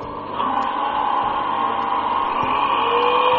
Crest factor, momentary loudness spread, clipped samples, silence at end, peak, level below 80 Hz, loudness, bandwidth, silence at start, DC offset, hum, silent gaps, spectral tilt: 14 dB; 4 LU; under 0.1%; 0 s; -6 dBFS; -50 dBFS; -20 LUFS; 6.6 kHz; 0 s; under 0.1%; none; none; -1 dB/octave